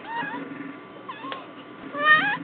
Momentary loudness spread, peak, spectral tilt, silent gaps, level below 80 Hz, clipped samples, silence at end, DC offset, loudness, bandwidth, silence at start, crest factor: 23 LU; -6 dBFS; -0.5 dB/octave; none; -76 dBFS; under 0.1%; 0 s; under 0.1%; -23 LUFS; 4.6 kHz; 0 s; 22 dB